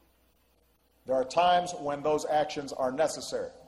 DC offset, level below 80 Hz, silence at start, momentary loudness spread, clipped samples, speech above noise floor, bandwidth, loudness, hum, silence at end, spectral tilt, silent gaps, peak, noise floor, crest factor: under 0.1%; -64 dBFS; 1.05 s; 10 LU; under 0.1%; 39 dB; 12.5 kHz; -29 LUFS; none; 0.1 s; -3.5 dB/octave; none; -14 dBFS; -68 dBFS; 18 dB